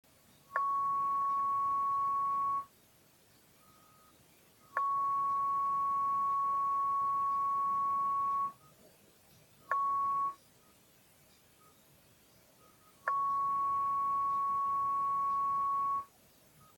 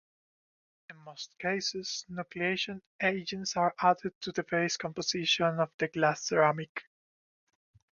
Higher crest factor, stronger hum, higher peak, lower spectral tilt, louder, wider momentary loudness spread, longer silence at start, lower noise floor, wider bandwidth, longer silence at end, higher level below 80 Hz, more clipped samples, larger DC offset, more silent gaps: about the same, 18 dB vs 22 dB; neither; second, -16 dBFS vs -12 dBFS; about the same, -4 dB/octave vs -3.5 dB/octave; about the same, -33 LUFS vs -31 LUFS; second, 4 LU vs 13 LU; second, 0.5 s vs 0.9 s; second, -65 dBFS vs under -90 dBFS; first, 17.5 kHz vs 7.4 kHz; second, 0.75 s vs 1.15 s; about the same, -74 dBFS vs -70 dBFS; neither; neither; second, none vs 2.87-2.99 s, 4.15-4.21 s, 5.74-5.79 s, 6.69-6.75 s